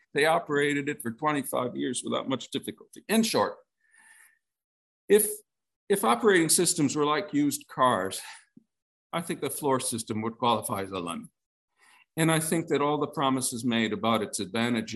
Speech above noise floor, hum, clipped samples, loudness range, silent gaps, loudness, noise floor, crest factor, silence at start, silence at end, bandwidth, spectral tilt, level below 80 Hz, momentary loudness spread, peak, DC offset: 34 dB; none; under 0.1%; 6 LU; 4.64-5.08 s, 5.76-5.87 s, 8.82-9.10 s, 11.46-11.68 s; -27 LUFS; -61 dBFS; 20 dB; 0.15 s; 0 s; 13.5 kHz; -3.5 dB/octave; -74 dBFS; 12 LU; -8 dBFS; under 0.1%